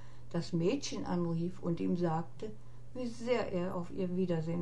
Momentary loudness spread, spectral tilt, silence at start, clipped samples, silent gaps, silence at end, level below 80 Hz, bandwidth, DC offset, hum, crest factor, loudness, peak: 11 LU; -6.5 dB/octave; 0 s; under 0.1%; none; 0 s; -60 dBFS; 10.5 kHz; 0.8%; none; 16 dB; -36 LUFS; -20 dBFS